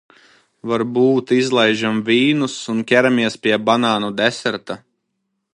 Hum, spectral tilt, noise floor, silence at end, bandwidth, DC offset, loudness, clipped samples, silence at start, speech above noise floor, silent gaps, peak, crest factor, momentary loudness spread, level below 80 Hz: none; -5 dB/octave; -73 dBFS; 0.75 s; 11 kHz; under 0.1%; -17 LUFS; under 0.1%; 0.65 s; 56 dB; none; 0 dBFS; 18 dB; 9 LU; -64 dBFS